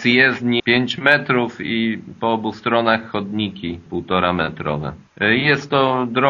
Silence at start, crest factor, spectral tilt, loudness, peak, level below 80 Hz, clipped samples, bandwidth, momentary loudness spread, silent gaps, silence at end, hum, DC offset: 0 s; 18 dB; -3 dB/octave; -18 LUFS; 0 dBFS; -50 dBFS; under 0.1%; 7.4 kHz; 10 LU; none; 0 s; none; under 0.1%